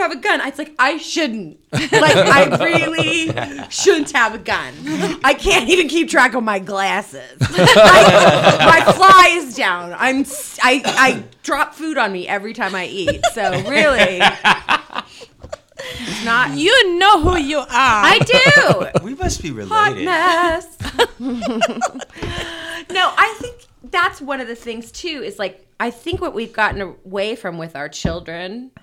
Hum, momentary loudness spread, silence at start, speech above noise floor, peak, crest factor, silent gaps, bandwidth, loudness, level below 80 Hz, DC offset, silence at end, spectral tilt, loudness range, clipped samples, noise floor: none; 17 LU; 0 s; 24 dB; 0 dBFS; 14 dB; none; 17 kHz; -14 LUFS; -38 dBFS; under 0.1%; 0.15 s; -3.5 dB/octave; 12 LU; under 0.1%; -39 dBFS